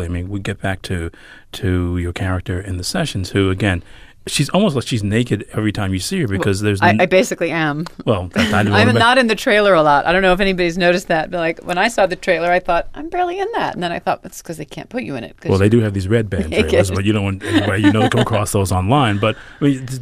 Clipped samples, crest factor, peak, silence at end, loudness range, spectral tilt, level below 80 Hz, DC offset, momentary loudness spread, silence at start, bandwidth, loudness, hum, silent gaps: under 0.1%; 16 dB; -2 dBFS; 0 s; 7 LU; -5.5 dB/octave; -38 dBFS; under 0.1%; 11 LU; 0 s; 15.5 kHz; -17 LUFS; none; none